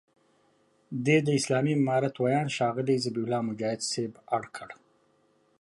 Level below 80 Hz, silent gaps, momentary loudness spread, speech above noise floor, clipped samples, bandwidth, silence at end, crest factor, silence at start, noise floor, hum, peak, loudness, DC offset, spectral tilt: -74 dBFS; none; 9 LU; 40 dB; under 0.1%; 11.5 kHz; 0.85 s; 18 dB; 0.9 s; -67 dBFS; 50 Hz at -55 dBFS; -12 dBFS; -28 LUFS; under 0.1%; -5.5 dB/octave